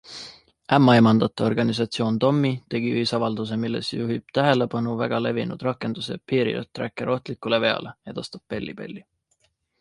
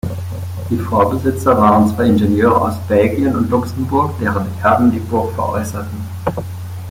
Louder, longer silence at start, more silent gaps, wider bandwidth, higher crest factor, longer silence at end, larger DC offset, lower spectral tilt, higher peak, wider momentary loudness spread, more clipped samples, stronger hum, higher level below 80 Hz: second, -23 LUFS vs -15 LUFS; about the same, 0.05 s vs 0.05 s; neither; second, 11.5 kHz vs 16.5 kHz; first, 22 dB vs 14 dB; first, 0.8 s vs 0 s; neither; about the same, -6.5 dB/octave vs -7.5 dB/octave; about the same, -2 dBFS vs -2 dBFS; first, 16 LU vs 13 LU; neither; neither; second, -60 dBFS vs -44 dBFS